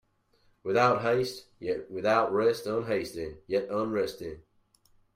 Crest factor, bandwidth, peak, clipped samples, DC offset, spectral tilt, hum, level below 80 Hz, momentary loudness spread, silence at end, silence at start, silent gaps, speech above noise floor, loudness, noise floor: 18 dB; 16 kHz; -12 dBFS; under 0.1%; under 0.1%; -5.5 dB/octave; none; -62 dBFS; 15 LU; 0.75 s; 0.65 s; none; 39 dB; -29 LUFS; -67 dBFS